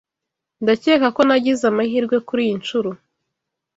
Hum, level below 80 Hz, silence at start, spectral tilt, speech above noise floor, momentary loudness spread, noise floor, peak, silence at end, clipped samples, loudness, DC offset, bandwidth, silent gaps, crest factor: none; -62 dBFS; 0.6 s; -5 dB/octave; 65 dB; 8 LU; -83 dBFS; -2 dBFS; 0.8 s; under 0.1%; -18 LUFS; under 0.1%; 8 kHz; none; 18 dB